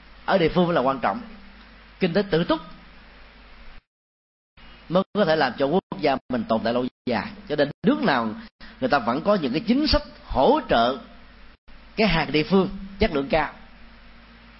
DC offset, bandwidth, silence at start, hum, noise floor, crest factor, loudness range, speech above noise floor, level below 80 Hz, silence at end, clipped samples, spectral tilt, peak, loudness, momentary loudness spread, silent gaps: under 0.1%; 5.8 kHz; 0.3 s; none; -48 dBFS; 18 dB; 6 LU; 26 dB; -40 dBFS; 0.75 s; under 0.1%; -9.5 dB/octave; -6 dBFS; -23 LUFS; 9 LU; 3.87-4.57 s, 5.06-5.13 s, 5.83-5.90 s, 6.21-6.29 s, 6.91-7.05 s, 7.74-7.82 s, 8.51-8.59 s, 11.58-11.67 s